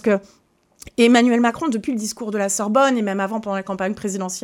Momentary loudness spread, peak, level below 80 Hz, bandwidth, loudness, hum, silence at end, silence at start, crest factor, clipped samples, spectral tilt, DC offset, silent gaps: 11 LU; -2 dBFS; -58 dBFS; 15.5 kHz; -19 LUFS; none; 0 s; 0.05 s; 18 dB; under 0.1%; -4 dB/octave; under 0.1%; none